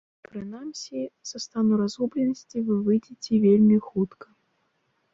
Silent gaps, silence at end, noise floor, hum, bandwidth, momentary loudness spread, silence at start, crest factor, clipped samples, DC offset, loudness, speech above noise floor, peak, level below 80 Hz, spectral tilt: none; 1.05 s; -72 dBFS; none; 7.6 kHz; 17 LU; 0.35 s; 16 dB; under 0.1%; under 0.1%; -24 LUFS; 48 dB; -10 dBFS; -66 dBFS; -7 dB/octave